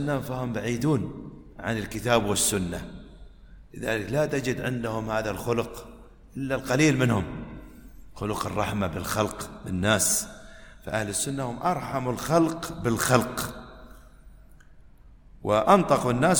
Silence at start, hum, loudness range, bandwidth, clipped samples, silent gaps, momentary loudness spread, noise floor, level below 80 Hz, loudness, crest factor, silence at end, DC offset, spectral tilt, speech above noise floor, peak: 0 s; none; 3 LU; 19.5 kHz; under 0.1%; none; 18 LU; -50 dBFS; -48 dBFS; -26 LUFS; 24 dB; 0 s; under 0.1%; -4.5 dB/octave; 25 dB; -4 dBFS